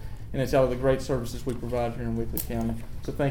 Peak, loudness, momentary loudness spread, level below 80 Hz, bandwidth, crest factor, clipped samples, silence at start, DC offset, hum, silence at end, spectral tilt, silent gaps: -10 dBFS; -28 LUFS; 10 LU; -38 dBFS; 18 kHz; 18 dB; under 0.1%; 0 s; 1%; none; 0 s; -6.5 dB/octave; none